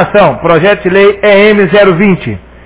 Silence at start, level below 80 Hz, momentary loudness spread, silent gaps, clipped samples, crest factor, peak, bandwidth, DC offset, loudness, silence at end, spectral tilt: 0 s; -34 dBFS; 5 LU; none; 4%; 6 dB; 0 dBFS; 4 kHz; under 0.1%; -6 LUFS; 0.25 s; -10 dB/octave